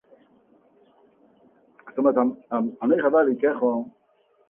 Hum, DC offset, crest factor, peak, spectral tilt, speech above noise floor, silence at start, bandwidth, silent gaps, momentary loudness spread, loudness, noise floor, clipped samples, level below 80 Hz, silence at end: none; under 0.1%; 18 dB; -6 dBFS; -10 dB/octave; 42 dB; 1.85 s; 3.5 kHz; none; 10 LU; -23 LUFS; -64 dBFS; under 0.1%; -72 dBFS; 0.6 s